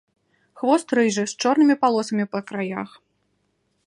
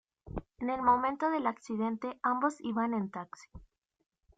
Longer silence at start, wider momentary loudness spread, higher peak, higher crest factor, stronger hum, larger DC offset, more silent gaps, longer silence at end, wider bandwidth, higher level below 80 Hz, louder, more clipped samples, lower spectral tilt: first, 0.55 s vs 0.25 s; second, 11 LU vs 17 LU; first, -4 dBFS vs -14 dBFS; about the same, 18 dB vs 20 dB; neither; neither; neither; first, 1 s vs 0.75 s; first, 11.5 kHz vs 9.2 kHz; second, -72 dBFS vs -58 dBFS; first, -21 LUFS vs -32 LUFS; neither; second, -4.5 dB/octave vs -6.5 dB/octave